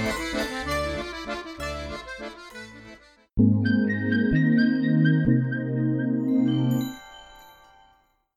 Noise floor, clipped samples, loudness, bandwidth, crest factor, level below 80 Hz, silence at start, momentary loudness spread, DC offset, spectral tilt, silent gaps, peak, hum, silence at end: -63 dBFS; under 0.1%; -24 LUFS; 14.5 kHz; 18 dB; -44 dBFS; 0 s; 18 LU; under 0.1%; -7 dB/octave; none; -8 dBFS; none; 0.95 s